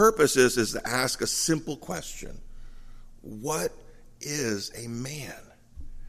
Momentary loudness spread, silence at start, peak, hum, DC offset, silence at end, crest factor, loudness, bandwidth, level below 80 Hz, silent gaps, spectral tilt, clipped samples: 20 LU; 0 s; -6 dBFS; none; under 0.1%; 0 s; 22 dB; -27 LUFS; 15.5 kHz; -46 dBFS; none; -3.5 dB/octave; under 0.1%